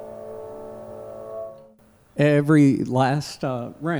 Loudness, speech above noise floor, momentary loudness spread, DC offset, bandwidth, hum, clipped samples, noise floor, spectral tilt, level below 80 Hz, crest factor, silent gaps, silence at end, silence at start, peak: -20 LUFS; 35 dB; 21 LU; under 0.1%; over 20 kHz; none; under 0.1%; -54 dBFS; -7.5 dB/octave; -60 dBFS; 18 dB; none; 0 s; 0 s; -6 dBFS